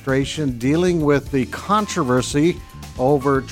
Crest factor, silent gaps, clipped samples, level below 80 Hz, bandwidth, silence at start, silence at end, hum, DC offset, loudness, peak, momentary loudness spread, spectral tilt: 14 dB; none; under 0.1%; -40 dBFS; 16.5 kHz; 0 s; 0 s; none; under 0.1%; -19 LUFS; -4 dBFS; 6 LU; -6 dB/octave